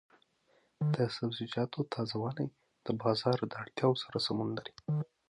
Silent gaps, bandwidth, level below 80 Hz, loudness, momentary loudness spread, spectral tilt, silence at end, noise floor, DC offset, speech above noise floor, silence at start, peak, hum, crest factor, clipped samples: none; 11 kHz; -72 dBFS; -35 LUFS; 8 LU; -7 dB/octave; 0.25 s; -72 dBFS; under 0.1%; 38 dB; 0.8 s; -16 dBFS; none; 20 dB; under 0.1%